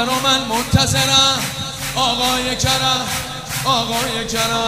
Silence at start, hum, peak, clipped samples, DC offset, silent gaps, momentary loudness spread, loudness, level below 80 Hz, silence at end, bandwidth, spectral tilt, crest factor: 0 s; none; 0 dBFS; under 0.1%; under 0.1%; none; 10 LU; -16 LUFS; -38 dBFS; 0 s; 16 kHz; -2.5 dB/octave; 18 dB